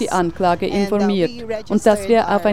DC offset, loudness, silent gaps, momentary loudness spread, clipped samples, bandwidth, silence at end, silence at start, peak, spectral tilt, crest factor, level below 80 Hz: 1%; -18 LUFS; none; 6 LU; under 0.1%; 14.5 kHz; 0 s; 0 s; 0 dBFS; -5.5 dB/octave; 16 dB; -44 dBFS